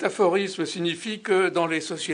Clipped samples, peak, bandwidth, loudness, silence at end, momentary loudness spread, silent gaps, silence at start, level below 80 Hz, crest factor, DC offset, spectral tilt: under 0.1%; -8 dBFS; 10 kHz; -24 LUFS; 0 s; 6 LU; none; 0 s; -72 dBFS; 18 dB; under 0.1%; -4 dB/octave